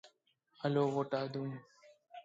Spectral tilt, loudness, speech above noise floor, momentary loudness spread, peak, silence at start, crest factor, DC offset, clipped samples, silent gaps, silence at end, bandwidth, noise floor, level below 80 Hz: -7.5 dB/octave; -37 LUFS; 39 dB; 16 LU; -20 dBFS; 0.05 s; 18 dB; under 0.1%; under 0.1%; none; 0.05 s; 7.8 kHz; -74 dBFS; -86 dBFS